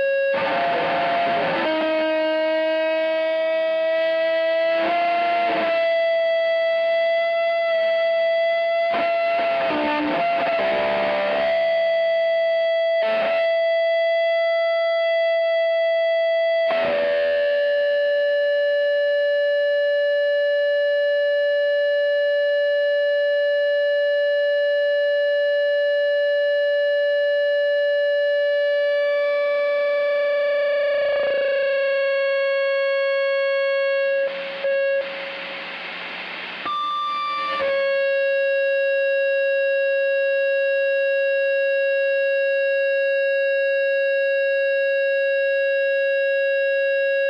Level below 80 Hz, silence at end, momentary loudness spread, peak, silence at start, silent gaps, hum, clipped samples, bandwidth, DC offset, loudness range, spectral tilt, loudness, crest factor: -70 dBFS; 0 s; 1 LU; -12 dBFS; 0 s; none; none; under 0.1%; 5.6 kHz; under 0.1%; 1 LU; -4.5 dB/octave; -20 LUFS; 8 dB